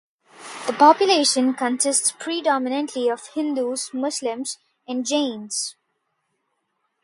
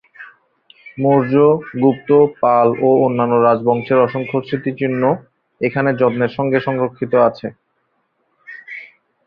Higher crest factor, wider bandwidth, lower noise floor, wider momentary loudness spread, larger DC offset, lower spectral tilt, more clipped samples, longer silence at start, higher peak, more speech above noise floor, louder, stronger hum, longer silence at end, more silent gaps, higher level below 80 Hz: first, 22 dB vs 16 dB; first, 11.5 kHz vs 5.2 kHz; first, -74 dBFS vs -66 dBFS; second, 14 LU vs 17 LU; neither; second, -1 dB/octave vs -10.5 dB/octave; neither; first, 0.4 s vs 0.2 s; about the same, -2 dBFS vs -2 dBFS; about the same, 53 dB vs 51 dB; second, -21 LUFS vs -16 LUFS; neither; first, 1.35 s vs 0.4 s; neither; second, -78 dBFS vs -58 dBFS